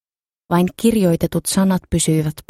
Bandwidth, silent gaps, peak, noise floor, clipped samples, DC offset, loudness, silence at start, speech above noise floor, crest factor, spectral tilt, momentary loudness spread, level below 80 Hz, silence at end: 16 kHz; none; -4 dBFS; -62 dBFS; under 0.1%; under 0.1%; -17 LUFS; 0.5 s; 45 dB; 14 dB; -5.5 dB/octave; 3 LU; -40 dBFS; 0.1 s